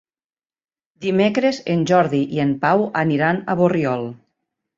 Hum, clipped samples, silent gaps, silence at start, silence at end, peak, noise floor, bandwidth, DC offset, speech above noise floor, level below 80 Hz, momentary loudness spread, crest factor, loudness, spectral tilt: none; under 0.1%; none; 1 s; 0.6 s; -2 dBFS; under -90 dBFS; 7.6 kHz; under 0.1%; over 72 dB; -60 dBFS; 6 LU; 18 dB; -19 LUFS; -7 dB/octave